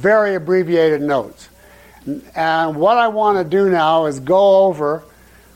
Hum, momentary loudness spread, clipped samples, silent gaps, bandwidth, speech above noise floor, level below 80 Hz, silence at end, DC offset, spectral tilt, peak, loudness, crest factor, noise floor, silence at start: none; 14 LU; under 0.1%; none; 16 kHz; 29 dB; -54 dBFS; 0.55 s; under 0.1%; -6.5 dB/octave; -4 dBFS; -15 LUFS; 12 dB; -44 dBFS; 0 s